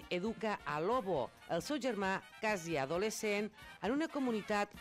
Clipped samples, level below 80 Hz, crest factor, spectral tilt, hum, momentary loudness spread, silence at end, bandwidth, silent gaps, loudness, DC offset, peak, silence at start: under 0.1%; -66 dBFS; 14 dB; -4.5 dB/octave; none; 4 LU; 0 s; 16 kHz; none; -37 LUFS; under 0.1%; -24 dBFS; 0 s